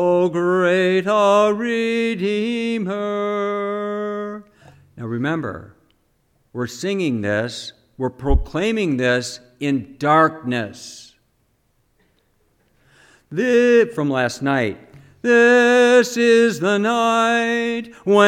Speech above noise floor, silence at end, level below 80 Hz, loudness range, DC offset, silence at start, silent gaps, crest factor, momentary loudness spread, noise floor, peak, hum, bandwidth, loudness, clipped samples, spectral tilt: 46 dB; 0 s; -36 dBFS; 11 LU; under 0.1%; 0 s; none; 18 dB; 15 LU; -64 dBFS; -2 dBFS; none; 15 kHz; -18 LUFS; under 0.1%; -5 dB/octave